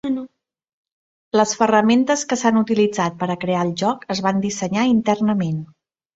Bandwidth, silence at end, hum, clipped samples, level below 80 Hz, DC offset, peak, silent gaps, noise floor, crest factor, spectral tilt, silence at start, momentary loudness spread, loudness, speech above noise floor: 8 kHz; 0.5 s; none; under 0.1%; -60 dBFS; under 0.1%; -2 dBFS; 0.73-0.84 s, 0.92-1.31 s; -52 dBFS; 18 dB; -5 dB/octave; 0.05 s; 8 LU; -19 LUFS; 34 dB